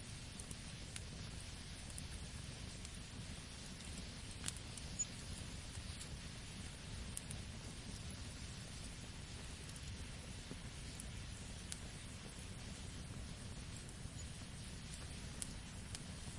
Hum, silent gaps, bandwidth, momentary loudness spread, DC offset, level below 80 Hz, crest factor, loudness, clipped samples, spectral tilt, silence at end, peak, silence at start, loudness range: none; none; 11.5 kHz; 4 LU; under 0.1%; -56 dBFS; 32 dB; -50 LUFS; under 0.1%; -3.5 dB/octave; 0 s; -18 dBFS; 0 s; 3 LU